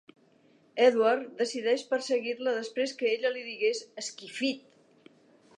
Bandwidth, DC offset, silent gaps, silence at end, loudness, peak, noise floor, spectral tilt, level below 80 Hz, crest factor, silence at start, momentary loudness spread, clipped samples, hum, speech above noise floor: 10.5 kHz; under 0.1%; none; 1 s; -29 LUFS; -10 dBFS; -63 dBFS; -2.5 dB/octave; -88 dBFS; 20 dB; 0.75 s; 13 LU; under 0.1%; none; 34 dB